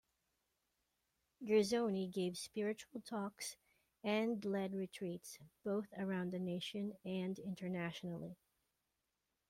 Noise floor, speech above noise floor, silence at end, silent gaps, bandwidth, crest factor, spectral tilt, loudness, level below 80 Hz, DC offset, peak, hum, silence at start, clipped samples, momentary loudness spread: -88 dBFS; 47 dB; 1.15 s; none; 16 kHz; 20 dB; -5.5 dB/octave; -42 LUFS; -80 dBFS; under 0.1%; -24 dBFS; none; 1.4 s; under 0.1%; 12 LU